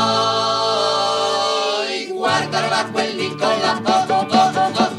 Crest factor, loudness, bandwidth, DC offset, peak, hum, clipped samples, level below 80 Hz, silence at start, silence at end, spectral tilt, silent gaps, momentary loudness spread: 16 dB; -18 LUFS; 13 kHz; under 0.1%; -2 dBFS; none; under 0.1%; -62 dBFS; 0 s; 0 s; -3.5 dB/octave; none; 5 LU